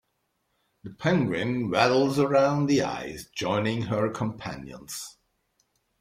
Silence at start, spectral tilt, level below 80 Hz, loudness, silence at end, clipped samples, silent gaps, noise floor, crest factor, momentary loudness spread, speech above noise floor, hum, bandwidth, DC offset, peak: 0.85 s; -5.5 dB/octave; -60 dBFS; -25 LUFS; 0.9 s; under 0.1%; none; -76 dBFS; 20 dB; 15 LU; 50 dB; none; 16 kHz; under 0.1%; -6 dBFS